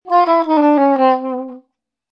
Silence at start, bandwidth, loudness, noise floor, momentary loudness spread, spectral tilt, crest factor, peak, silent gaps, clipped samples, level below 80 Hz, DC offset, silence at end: 0.05 s; 6 kHz; -14 LUFS; -65 dBFS; 13 LU; -6 dB/octave; 14 dB; 0 dBFS; none; under 0.1%; -74 dBFS; under 0.1%; 0.55 s